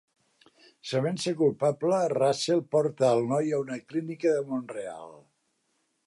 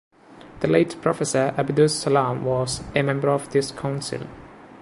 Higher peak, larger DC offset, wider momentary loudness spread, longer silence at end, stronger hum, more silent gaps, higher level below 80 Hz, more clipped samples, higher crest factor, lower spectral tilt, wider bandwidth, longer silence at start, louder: second, -12 dBFS vs -4 dBFS; neither; first, 12 LU vs 9 LU; first, 0.85 s vs 0 s; neither; neither; second, -78 dBFS vs -52 dBFS; neither; about the same, 16 dB vs 20 dB; about the same, -5.5 dB/octave vs -5 dB/octave; about the same, 11.5 kHz vs 11.5 kHz; first, 0.85 s vs 0.3 s; second, -27 LUFS vs -22 LUFS